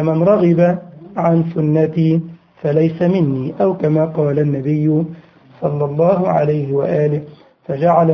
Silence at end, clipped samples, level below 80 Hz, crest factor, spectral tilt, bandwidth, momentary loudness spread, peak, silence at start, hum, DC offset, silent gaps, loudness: 0 s; under 0.1%; -54 dBFS; 14 dB; -11 dB/octave; 6 kHz; 11 LU; 0 dBFS; 0 s; none; under 0.1%; none; -16 LUFS